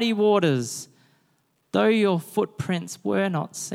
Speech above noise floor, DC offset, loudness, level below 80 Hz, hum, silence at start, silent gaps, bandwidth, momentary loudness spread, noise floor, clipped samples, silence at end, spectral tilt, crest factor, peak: 45 dB; under 0.1%; -24 LUFS; -68 dBFS; none; 0 s; none; 16 kHz; 10 LU; -68 dBFS; under 0.1%; 0 s; -5.5 dB/octave; 18 dB; -6 dBFS